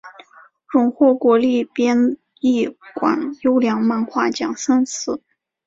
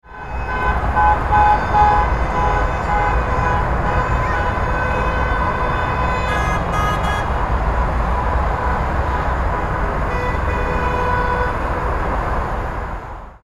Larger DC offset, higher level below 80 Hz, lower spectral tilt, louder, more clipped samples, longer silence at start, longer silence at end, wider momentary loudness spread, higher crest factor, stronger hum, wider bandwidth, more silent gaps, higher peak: neither; second, -64 dBFS vs -22 dBFS; second, -4.5 dB/octave vs -6.5 dB/octave; about the same, -18 LUFS vs -19 LUFS; neither; about the same, 0.05 s vs 0.05 s; first, 0.5 s vs 0.1 s; about the same, 7 LU vs 7 LU; about the same, 16 dB vs 16 dB; neither; second, 7.8 kHz vs 12 kHz; neither; about the same, -2 dBFS vs -2 dBFS